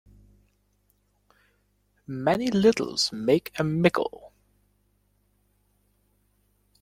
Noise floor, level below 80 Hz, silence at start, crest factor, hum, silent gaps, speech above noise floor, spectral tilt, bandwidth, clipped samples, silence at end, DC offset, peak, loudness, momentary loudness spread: -69 dBFS; -60 dBFS; 2.1 s; 24 dB; 50 Hz at -50 dBFS; none; 45 dB; -5 dB/octave; 16.5 kHz; under 0.1%; 2.55 s; under 0.1%; -6 dBFS; -24 LUFS; 8 LU